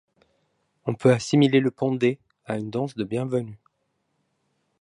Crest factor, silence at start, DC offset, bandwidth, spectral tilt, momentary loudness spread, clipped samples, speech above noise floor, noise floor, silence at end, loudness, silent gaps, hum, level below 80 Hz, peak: 20 dB; 0.85 s; under 0.1%; 11 kHz; -6.5 dB/octave; 13 LU; under 0.1%; 51 dB; -74 dBFS; 1.25 s; -24 LUFS; none; none; -66 dBFS; -6 dBFS